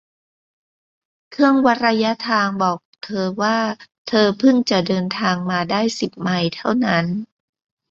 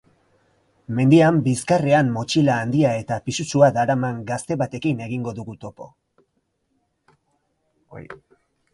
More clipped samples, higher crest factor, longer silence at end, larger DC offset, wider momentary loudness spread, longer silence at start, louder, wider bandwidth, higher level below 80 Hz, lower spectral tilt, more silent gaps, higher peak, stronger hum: neither; about the same, 18 dB vs 20 dB; about the same, 0.65 s vs 0.6 s; neither; second, 10 LU vs 19 LU; first, 1.3 s vs 0.9 s; about the same, -19 LUFS vs -20 LUFS; second, 7.8 kHz vs 11.5 kHz; about the same, -60 dBFS vs -58 dBFS; about the same, -5.5 dB/octave vs -6.5 dB/octave; first, 2.85-2.93 s, 3.98-4.05 s vs none; about the same, -2 dBFS vs -2 dBFS; neither